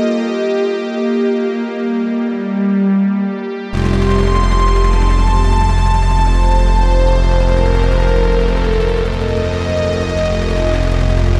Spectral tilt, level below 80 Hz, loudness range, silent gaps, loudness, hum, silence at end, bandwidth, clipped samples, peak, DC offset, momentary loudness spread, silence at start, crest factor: -7 dB/octave; -14 dBFS; 3 LU; none; -15 LUFS; none; 0 s; 9.2 kHz; under 0.1%; 0 dBFS; under 0.1%; 5 LU; 0 s; 12 dB